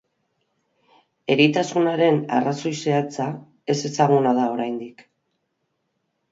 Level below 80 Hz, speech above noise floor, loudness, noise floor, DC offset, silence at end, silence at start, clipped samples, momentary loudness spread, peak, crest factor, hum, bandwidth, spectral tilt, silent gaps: -70 dBFS; 54 dB; -21 LUFS; -74 dBFS; under 0.1%; 1.3 s; 1.3 s; under 0.1%; 12 LU; -4 dBFS; 20 dB; none; 7.8 kHz; -5.5 dB/octave; none